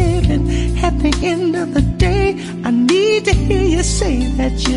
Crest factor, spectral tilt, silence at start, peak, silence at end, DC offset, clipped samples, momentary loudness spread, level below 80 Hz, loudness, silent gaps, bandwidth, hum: 12 dB; -5.5 dB/octave; 0 s; -2 dBFS; 0 s; under 0.1%; under 0.1%; 4 LU; -20 dBFS; -16 LUFS; none; 11.5 kHz; none